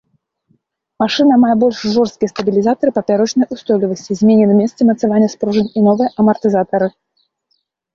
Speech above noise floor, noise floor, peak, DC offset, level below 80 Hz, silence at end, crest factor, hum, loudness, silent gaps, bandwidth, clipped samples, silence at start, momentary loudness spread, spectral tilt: 53 dB; -66 dBFS; 0 dBFS; under 0.1%; -56 dBFS; 1.05 s; 14 dB; none; -14 LUFS; none; 7.2 kHz; under 0.1%; 1 s; 7 LU; -6.5 dB/octave